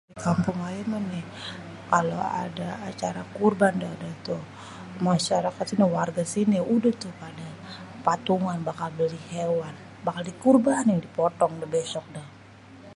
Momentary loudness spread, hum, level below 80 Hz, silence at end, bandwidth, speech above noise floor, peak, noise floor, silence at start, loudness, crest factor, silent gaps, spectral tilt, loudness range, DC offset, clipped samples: 17 LU; none; -62 dBFS; 0 s; 11.5 kHz; 22 dB; -6 dBFS; -48 dBFS; 0.1 s; -26 LUFS; 22 dB; none; -6 dB/octave; 3 LU; under 0.1%; under 0.1%